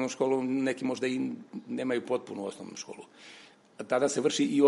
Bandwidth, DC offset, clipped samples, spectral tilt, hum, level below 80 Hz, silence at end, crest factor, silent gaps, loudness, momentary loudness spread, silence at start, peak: 11.5 kHz; under 0.1%; under 0.1%; -4.5 dB/octave; none; -80 dBFS; 0 s; 20 dB; none; -31 LUFS; 19 LU; 0 s; -10 dBFS